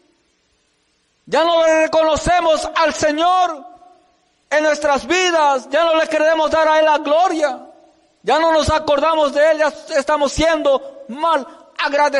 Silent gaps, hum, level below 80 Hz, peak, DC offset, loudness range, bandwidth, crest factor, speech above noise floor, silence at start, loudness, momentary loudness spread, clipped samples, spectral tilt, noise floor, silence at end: none; none; -40 dBFS; -6 dBFS; under 0.1%; 2 LU; 11.5 kHz; 10 dB; 47 dB; 1.25 s; -16 LUFS; 7 LU; under 0.1%; -3.5 dB/octave; -63 dBFS; 0 s